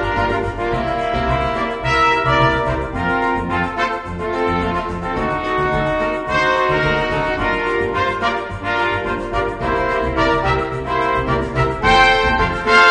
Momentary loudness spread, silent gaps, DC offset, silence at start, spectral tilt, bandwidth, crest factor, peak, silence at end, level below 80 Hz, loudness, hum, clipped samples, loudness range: 7 LU; none; under 0.1%; 0 s; -5.5 dB/octave; 10 kHz; 18 dB; 0 dBFS; 0 s; -32 dBFS; -17 LUFS; none; under 0.1%; 3 LU